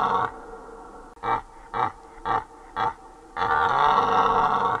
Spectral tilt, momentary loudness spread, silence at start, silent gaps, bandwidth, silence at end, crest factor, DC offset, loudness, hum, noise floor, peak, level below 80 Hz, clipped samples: -5 dB/octave; 22 LU; 0 s; none; 11 kHz; 0 s; 18 dB; under 0.1%; -24 LUFS; none; -43 dBFS; -6 dBFS; -50 dBFS; under 0.1%